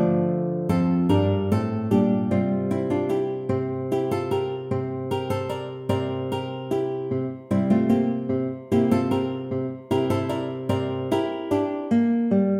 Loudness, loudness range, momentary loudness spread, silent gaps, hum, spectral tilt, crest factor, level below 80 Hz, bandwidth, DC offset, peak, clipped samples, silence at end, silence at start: -24 LUFS; 4 LU; 7 LU; none; none; -8.5 dB/octave; 16 dB; -56 dBFS; 14 kHz; under 0.1%; -8 dBFS; under 0.1%; 0 s; 0 s